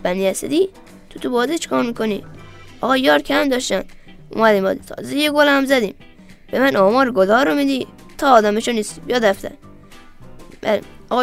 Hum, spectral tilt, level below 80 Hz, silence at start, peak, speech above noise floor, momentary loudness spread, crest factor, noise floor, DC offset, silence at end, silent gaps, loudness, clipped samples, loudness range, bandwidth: none; -4 dB/octave; -46 dBFS; 0 s; 0 dBFS; 24 dB; 13 LU; 18 dB; -41 dBFS; under 0.1%; 0 s; none; -17 LUFS; under 0.1%; 3 LU; 16 kHz